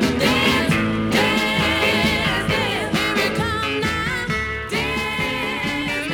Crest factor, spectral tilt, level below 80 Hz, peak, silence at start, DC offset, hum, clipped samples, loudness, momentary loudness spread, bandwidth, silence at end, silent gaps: 16 dB; -4.5 dB/octave; -38 dBFS; -4 dBFS; 0 s; under 0.1%; none; under 0.1%; -19 LUFS; 5 LU; 19 kHz; 0 s; none